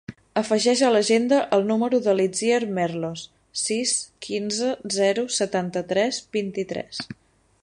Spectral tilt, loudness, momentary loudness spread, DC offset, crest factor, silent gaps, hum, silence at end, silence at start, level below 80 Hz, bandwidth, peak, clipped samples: -3.5 dB/octave; -23 LUFS; 11 LU; under 0.1%; 18 dB; none; none; 0.5 s; 0.1 s; -64 dBFS; 11.5 kHz; -6 dBFS; under 0.1%